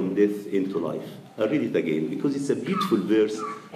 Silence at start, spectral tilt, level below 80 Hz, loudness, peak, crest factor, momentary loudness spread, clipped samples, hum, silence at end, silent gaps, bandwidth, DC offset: 0 s; -6.5 dB/octave; -74 dBFS; -25 LUFS; -10 dBFS; 16 dB; 8 LU; under 0.1%; none; 0 s; none; 15 kHz; under 0.1%